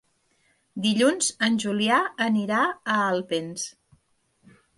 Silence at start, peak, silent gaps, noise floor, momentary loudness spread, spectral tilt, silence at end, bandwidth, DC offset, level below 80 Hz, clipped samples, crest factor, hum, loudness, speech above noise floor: 0.75 s; -8 dBFS; none; -67 dBFS; 11 LU; -3.5 dB/octave; 1.05 s; 11.5 kHz; under 0.1%; -72 dBFS; under 0.1%; 18 dB; none; -24 LUFS; 44 dB